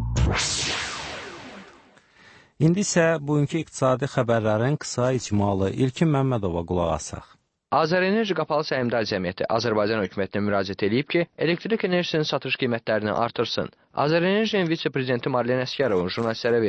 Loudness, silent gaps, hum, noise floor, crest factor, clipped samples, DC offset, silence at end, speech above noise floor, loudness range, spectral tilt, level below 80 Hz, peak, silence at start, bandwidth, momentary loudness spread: -24 LUFS; none; none; -54 dBFS; 16 dB; under 0.1%; under 0.1%; 0 s; 31 dB; 2 LU; -5 dB/octave; -42 dBFS; -8 dBFS; 0 s; 8.8 kHz; 5 LU